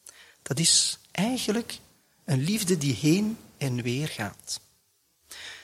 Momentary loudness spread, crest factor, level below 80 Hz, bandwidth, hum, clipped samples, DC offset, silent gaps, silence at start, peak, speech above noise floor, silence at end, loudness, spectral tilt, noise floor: 21 LU; 20 dB; -64 dBFS; 16.5 kHz; none; under 0.1%; under 0.1%; none; 0.05 s; -8 dBFS; 42 dB; 0 s; -26 LUFS; -3.5 dB/octave; -68 dBFS